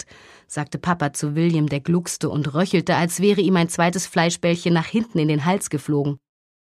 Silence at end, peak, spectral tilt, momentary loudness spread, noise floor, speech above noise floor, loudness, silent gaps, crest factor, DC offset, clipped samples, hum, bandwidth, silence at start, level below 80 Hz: 0.55 s; -2 dBFS; -5.5 dB/octave; 8 LU; -46 dBFS; 26 dB; -21 LUFS; none; 18 dB; under 0.1%; under 0.1%; none; 14 kHz; 0.5 s; -58 dBFS